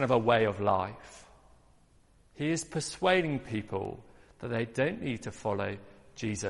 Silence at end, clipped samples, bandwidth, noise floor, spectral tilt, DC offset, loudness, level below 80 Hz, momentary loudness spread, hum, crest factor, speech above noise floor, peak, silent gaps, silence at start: 0 s; under 0.1%; 11.5 kHz; -62 dBFS; -5 dB/octave; under 0.1%; -31 LUFS; -60 dBFS; 18 LU; none; 22 dB; 32 dB; -10 dBFS; none; 0 s